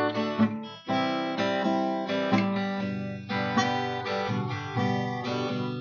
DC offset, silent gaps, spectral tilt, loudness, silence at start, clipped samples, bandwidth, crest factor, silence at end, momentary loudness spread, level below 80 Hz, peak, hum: under 0.1%; none; -6 dB/octave; -28 LUFS; 0 s; under 0.1%; 7 kHz; 18 dB; 0 s; 5 LU; -68 dBFS; -10 dBFS; none